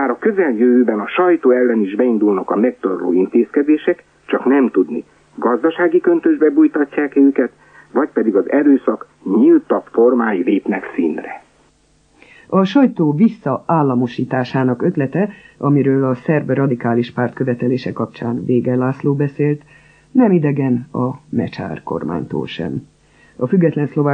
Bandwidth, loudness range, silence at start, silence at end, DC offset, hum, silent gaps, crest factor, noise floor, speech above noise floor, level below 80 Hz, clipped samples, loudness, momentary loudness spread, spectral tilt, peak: 6.2 kHz; 4 LU; 0 s; 0 s; under 0.1%; none; none; 14 dB; -55 dBFS; 40 dB; -58 dBFS; under 0.1%; -16 LUFS; 10 LU; -9.5 dB/octave; -2 dBFS